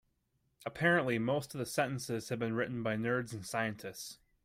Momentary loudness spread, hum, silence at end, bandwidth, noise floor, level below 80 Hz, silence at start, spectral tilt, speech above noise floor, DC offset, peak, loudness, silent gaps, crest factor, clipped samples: 15 LU; none; 0.3 s; 16 kHz; -78 dBFS; -68 dBFS; 0.6 s; -5 dB/octave; 43 dB; under 0.1%; -18 dBFS; -35 LUFS; none; 18 dB; under 0.1%